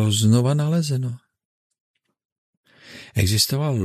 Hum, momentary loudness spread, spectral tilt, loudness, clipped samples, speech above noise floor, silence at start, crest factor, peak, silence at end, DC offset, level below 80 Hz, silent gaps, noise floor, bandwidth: none; 14 LU; -5 dB/octave; -20 LUFS; under 0.1%; 25 dB; 0 s; 18 dB; -4 dBFS; 0 s; under 0.1%; -50 dBFS; 1.45-1.70 s, 1.80-1.94 s, 2.25-2.64 s; -44 dBFS; 14 kHz